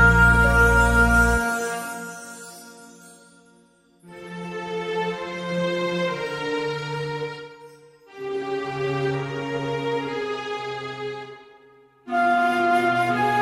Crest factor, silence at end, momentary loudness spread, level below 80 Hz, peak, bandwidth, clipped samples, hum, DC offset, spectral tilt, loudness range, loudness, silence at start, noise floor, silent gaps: 20 dB; 0 s; 20 LU; -32 dBFS; -4 dBFS; 16 kHz; under 0.1%; none; under 0.1%; -5.5 dB/octave; 11 LU; -22 LUFS; 0 s; -57 dBFS; none